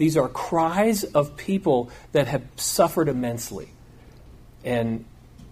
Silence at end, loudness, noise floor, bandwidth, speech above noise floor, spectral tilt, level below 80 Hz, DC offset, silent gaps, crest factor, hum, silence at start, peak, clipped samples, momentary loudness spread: 0 s; -24 LUFS; -47 dBFS; 15.5 kHz; 24 dB; -5 dB/octave; -50 dBFS; under 0.1%; none; 20 dB; none; 0 s; -4 dBFS; under 0.1%; 12 LU